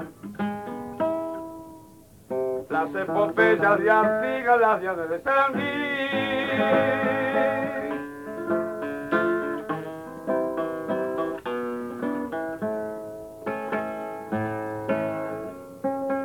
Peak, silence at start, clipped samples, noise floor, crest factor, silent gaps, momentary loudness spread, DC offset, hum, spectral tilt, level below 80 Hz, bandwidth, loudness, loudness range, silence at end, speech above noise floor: -8 dBFS; 0 s; under 0.1%; -50 dBFS; 18 dB; none; 14 LU; under 0.1%; none; -6.5 dB/octave; -62 dBFS; 19 kHz; -26 LUFS; 9 LU; 0 s; 28 dB